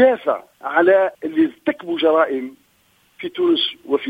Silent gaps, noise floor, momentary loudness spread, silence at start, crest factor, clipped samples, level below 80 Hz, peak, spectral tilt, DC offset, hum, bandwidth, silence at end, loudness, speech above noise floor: none; -59 dBFS; 12 LU; 0 s; 16 dB; under 0.1%; -66 dBFS; -2 dBFS; -5.5 dB/octave; under 0.1%; none; 5 kHz; 0 s; -18 LUFS; 41 dB